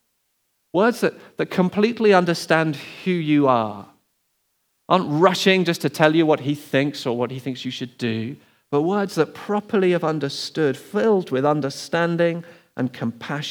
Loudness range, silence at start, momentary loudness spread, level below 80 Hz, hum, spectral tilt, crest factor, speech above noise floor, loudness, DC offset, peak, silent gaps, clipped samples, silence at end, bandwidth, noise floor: 4 LU; 0.75 s; 12 LU; -76 dBFS; none; -6 dB/octave; 22 dB; 50 dB; -21 LUFS; under 0.1%; 0 dBFS; none; under 0.1%; 0 s; 20 kHz; -70 dBFS